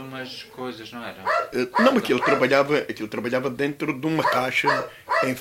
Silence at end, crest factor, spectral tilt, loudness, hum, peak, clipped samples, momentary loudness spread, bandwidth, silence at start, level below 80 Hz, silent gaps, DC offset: 0 s; 20 dB; -5 dB/octave; -22 LUFS; none; -4 dBFS; under 0.1%; 15 LU; 16 kHz; 0 s; -64 dBFS; none; under 0.1%